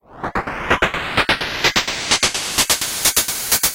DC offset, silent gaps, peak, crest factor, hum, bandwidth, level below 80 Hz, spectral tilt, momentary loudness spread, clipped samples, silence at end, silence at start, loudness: under 0.1%; none; 0 dBFS; 18 dB; none; 17 kHz; -38 dBFS; -1 dB/octave; 7 LU; under 0.1%; 0 s; 0.1 s; -17 LUFS